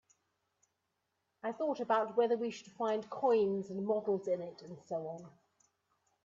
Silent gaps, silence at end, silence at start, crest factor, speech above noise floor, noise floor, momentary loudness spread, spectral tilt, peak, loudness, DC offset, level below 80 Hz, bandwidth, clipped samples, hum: none; 0.95 s; 1.45 s; 18 dB; 49 dB; -84 dBFS; 13 LU; -6.5 dB/octave; -20 dBFS; -35 LUFS; under 0.1%; -84 dBFS; 7.6 kHz; under 0.1%; none